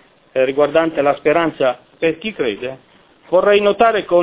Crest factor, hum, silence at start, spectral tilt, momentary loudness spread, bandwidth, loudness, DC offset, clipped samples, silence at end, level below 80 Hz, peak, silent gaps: 16 dB; none; 0.35 s; -9 dB/octave; 8 LU; 4 kHz; -16 LUFS; under 0.1%; under 0.1%; 0 s; -54 dBFS; 0 dBFS; none